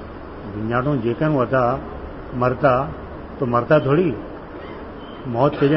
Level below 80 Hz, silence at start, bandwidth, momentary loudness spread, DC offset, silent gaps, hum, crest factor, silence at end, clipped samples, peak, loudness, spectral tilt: -40 dBFS; 0 s; 5.8 kHz; 17 LU; 0.1%; none; none; 18 dB; 0 s; under 0.1%; -4 dBFS; -20 LUFS; -12 dB/octave